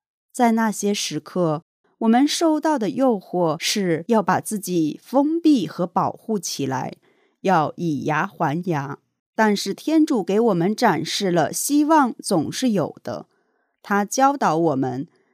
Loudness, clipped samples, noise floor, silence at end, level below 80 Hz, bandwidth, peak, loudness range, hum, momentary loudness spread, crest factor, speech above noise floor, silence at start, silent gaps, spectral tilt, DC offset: -21 LUFS; under 0.1%; -68 dBFS; 0.3 s; -74 dBFS; 15.5 kHz; -4 dBFS; 4 LU; none; 9 LU; 18 dB; 48 dB; 0.35 s; 1.62-1.84 s, 9.19-9.33 s; -5 dB/octave; under 0.1%